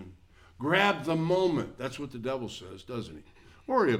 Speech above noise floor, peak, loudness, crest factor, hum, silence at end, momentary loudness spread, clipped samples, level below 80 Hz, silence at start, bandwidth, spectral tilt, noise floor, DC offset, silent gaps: 26 dB; -8 dBFS; -30 LUFS; 22 dB; none; 0 s; 18 LU; under 0.1%; -60 dBFS; 0 s; 15 kHz; -6 dB/octave; -55 dBFS; under 0.1%; none